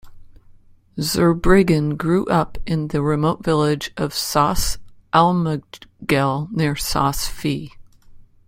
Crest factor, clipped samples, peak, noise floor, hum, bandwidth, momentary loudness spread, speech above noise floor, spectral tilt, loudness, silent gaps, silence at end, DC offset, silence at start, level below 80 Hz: 18 dB; under 0.1%; -2 dBFS; -48 dBFS; none; 16.5 kHz; 10 LU; 29 dB; -5.5 dB/octave; -19 LUFS; none; 0.25 s; under 0.1%; 0.05 s; -34 dBFS